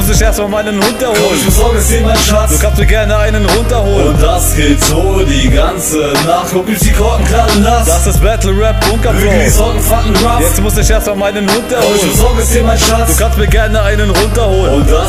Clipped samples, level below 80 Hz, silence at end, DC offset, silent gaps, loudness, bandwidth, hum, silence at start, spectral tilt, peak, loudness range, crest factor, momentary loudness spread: 0.2%; -12 dBFS; 0 s; under 0.1%; none; -10 LUFS; 16.5 kHz; none; 0 s; -4.5 dB/octave; 0 dBFS; 1 LU; 8 dB; 3 LU